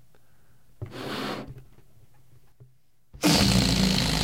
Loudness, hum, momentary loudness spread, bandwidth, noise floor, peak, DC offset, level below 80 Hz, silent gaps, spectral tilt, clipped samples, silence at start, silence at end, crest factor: -23 LUFS; none; 22 LU; 16.5 kHz; -62 dBFS; -8 dBFS; 0.3%; -40 dBFS; none; -4 dB/octave; under 0.1%; 0.8 s; 0 s; 20 dB